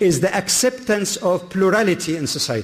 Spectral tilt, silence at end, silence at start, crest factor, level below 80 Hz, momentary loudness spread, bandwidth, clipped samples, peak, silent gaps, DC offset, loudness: -3.5 dB/octave; 0 s; 0 s; 14 dB; -52 dBFS; 5 LU; 15.5 kHz; under 0.1%; -6 dBFS; none; under 0.1%; -19 LUFS